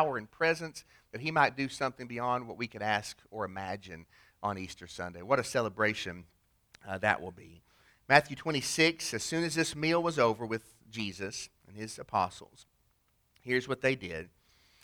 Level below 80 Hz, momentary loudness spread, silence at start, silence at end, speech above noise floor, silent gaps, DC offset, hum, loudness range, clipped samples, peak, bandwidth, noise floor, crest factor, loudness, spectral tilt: -66 dBFS; 17 LU; 0 s; 0.55 s; 40 dB; none; under 0.1%; none; 7 LU; under 0.1%; -6 dBFS; over 20 kHz; -72 dBFS; 26 dB; -32 LUFS; -4 dB/octave